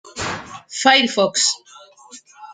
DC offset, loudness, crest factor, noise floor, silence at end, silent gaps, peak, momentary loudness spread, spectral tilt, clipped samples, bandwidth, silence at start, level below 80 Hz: under 0.1%; -17 LUFS; 20 dB; -45 dBFS; 0 s; none; -2 dBFS; 16 LU; -1.5 dB/octave; under 0.1%; 9.6 kHz; 0.05 s; -58 dBFS